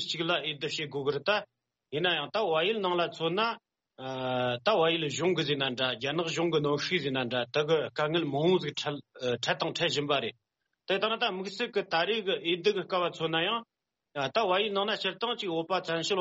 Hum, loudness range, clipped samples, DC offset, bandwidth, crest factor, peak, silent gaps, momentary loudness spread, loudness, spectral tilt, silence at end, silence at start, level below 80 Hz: none; 2 LU; under 0.1%; under 0.1%; 8 kHz; 18 dB; -12 dBFS; none; 6 LU; -29 LUFS; -2.5 dB/octave; 0 s; 0 s; -72 dBFS